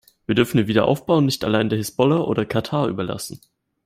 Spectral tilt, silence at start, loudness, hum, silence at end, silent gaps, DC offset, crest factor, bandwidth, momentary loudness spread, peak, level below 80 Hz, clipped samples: -6 dB/octave; 0.3 s; -20 LUFS; none; 0.5 s; none; under 0.1%; 18 dB; 16 kHz; 8 LU; -2 dBFS; -52 dBFS; under 0.1%